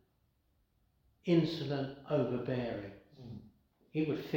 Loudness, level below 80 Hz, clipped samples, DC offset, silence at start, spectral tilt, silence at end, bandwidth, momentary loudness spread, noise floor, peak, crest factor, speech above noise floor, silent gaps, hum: -35 LUFS; -68 dBFS; under 0.1%; under 0.1%; 1.25 s; -8 dB/octave; 0 s; 16.5 kHz; 20 LU; -75 dBFS; -18 dBFS; 20 dB; 41 dB; none; none